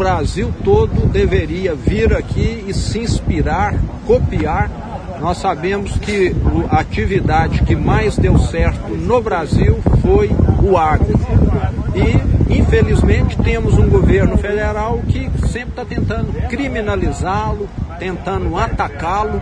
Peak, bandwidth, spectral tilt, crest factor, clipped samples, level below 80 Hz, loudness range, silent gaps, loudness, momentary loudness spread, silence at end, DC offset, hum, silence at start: 0 dBFS; 10 kHz; -7.5 dB/octave; 14 dB; under 0.1%; -20 dBFS; 5 LU; none; -16 LUFS; 8 LU; 0 s; under 0.1%; none; 0 s